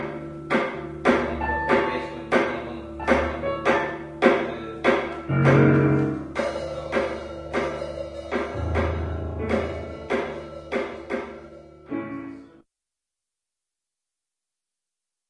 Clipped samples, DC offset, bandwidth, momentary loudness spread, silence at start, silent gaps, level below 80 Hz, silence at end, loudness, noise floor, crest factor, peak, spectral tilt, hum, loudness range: under 0.1%; under 0.1%; 10.5 kHz; 14 LU; 0 s; none; -44 dBFS; 2.85 s; -25 LUFS; -87 dBFS; 22 dB; -2 dBFS; -7.5 dB/octave; none; 15 LU